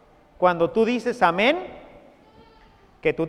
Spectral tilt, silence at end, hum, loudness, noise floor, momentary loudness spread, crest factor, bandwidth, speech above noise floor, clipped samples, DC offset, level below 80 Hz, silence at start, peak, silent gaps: -6 dB/octave; 0 s; none; -22 LUFS; -53 dBFS; 8 LU; 22 dB; 11.5 kHz; 33 dB; under 0.1%; under 0.1%; -56 dBFS; 0.4 s; -2 dBFS; none